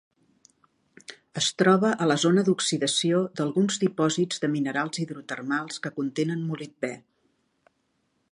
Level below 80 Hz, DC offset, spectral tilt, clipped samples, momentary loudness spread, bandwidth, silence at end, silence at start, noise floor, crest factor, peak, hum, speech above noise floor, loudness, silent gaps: -74 dBFS; under 0.1%; -4.5 dB/octave; under 0.1%; 13 LU; 11 kHz; 1.35 s; 1.1 s; -73 dBFS; 20 dB; -6 dBFS; none; 48 dB; -25 LUFS; none